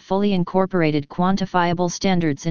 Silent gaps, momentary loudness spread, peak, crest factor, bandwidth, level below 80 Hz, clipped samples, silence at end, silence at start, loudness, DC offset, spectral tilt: none; 2 LU; -4 dBFS; 16 dB; 7.2 kHz; -46 dBFS; under 0.1%; 0 s; 0 s; -20 LUFS; 2%; -6 dB/octave